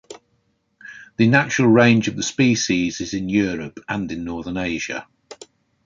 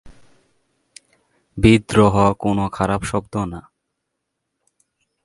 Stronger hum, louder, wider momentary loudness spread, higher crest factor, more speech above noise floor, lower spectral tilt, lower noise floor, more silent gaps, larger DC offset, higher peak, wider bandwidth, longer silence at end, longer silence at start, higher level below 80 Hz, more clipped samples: neither; about the same, -19 LUFS vs -18 LUFS; about the same, 15 LU vs 14 LU; about the same, 20 dB vs 20 dB; second, 48 dB vs 60 dB; second, -5 dB/octave vs -6.5 dB/octave; second, -67 dBFS vs -77 dBFS; neither; neither; about the same, 0 dBFS vs 0 dBFS; second, 7.6 kHz vs 11.5 kHz; second, 0.5 s vs 1.65 s; about the same, 0.1 s vs 0.05 s; second, -50 dBFS vs -38 dBFS; neither